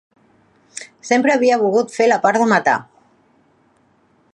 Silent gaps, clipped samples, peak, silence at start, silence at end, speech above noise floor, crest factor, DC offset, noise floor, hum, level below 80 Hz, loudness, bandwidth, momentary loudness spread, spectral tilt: none; under 0.1%; 0 dBFS; 0.75 s; 1.5 s; 43 dB; 18 dB; under 0.1%; -58 dBFS; none; -72 dBFS; -16 LUFS; 11 kHz; 19 LU; -4.5 dB/octave